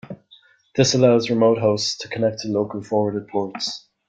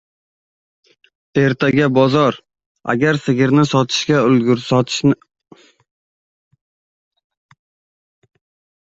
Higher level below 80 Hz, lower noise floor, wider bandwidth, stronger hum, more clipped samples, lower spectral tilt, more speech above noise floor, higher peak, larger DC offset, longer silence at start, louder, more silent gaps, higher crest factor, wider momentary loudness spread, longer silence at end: about the same, -60 dBFS vs -56 dBFS; second, -54 dBFS vs under -90 dBFS; first, 9.2 kHz vs 8 kHz; neither; neither; about the same, -5 dB/octave vs -6 dB/octave; second, 34 dB vs over 76 dB; about the same, -4 dBFS vs -2 dBFS; neither; second, 0.1 s vs 1.35 s; second, -20 LUFS vs -15 LUFS; second, none vs 2.66-2.75 s; about the same, 18 dB vs 16 dB; about the same, 11 LU vs 9 LU; second, 0.3 s vs 3.65 s